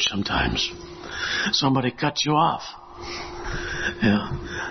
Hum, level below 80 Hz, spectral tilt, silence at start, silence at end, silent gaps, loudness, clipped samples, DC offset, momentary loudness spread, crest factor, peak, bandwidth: none; -42 dBFS; -4 dB/octave; 0 s; 0 s; none; -24 LUFS; under 0.1%; under 0.1%; 14 LU; 18 dB; -8 dBFS; 6.4 kHz